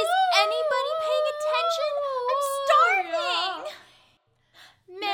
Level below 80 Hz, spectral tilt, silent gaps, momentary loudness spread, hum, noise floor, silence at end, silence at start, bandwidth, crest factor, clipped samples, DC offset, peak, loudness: -76 dBFS; 0 dB/octave; none; 9 LU; none; -65 dBFS; 0 s; 0 s; 19.5 kHz; 20 dB; under 0.1%; under 0.1%; -6 dBFS; -24 LUFS